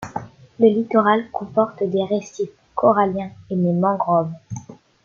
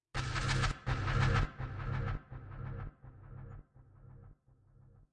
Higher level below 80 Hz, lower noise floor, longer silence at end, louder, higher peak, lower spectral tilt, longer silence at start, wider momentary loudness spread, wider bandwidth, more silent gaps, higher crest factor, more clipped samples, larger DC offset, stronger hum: second, -58 dBFS vs -44 dBFS; second, -38 dBFS vs -65 dBFS; second, 0.3 s vs 0.8 s; first, -20 LUFS vs -36 LUFS; first, -2 dBFS vs -16 dBFS; first, -7.5 dB/octave vs -5 dB/octave; second, 0 s vs 0.15 s; second, 14 LU vs 24 LU; second, 7.4 kHz vs 10.5 kHz; neither; about the same, 18 dB vs 20 dB; neither; neither; neither